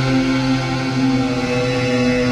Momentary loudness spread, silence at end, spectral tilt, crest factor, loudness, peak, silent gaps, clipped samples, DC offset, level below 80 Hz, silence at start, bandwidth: 2 LU; 0 s; -6 dB/octave; 10 dB; -18 LUFS; -6 dBFS; none; under 0.1%; under 0.1%; -38 dBFS; 0 s; 11 kHz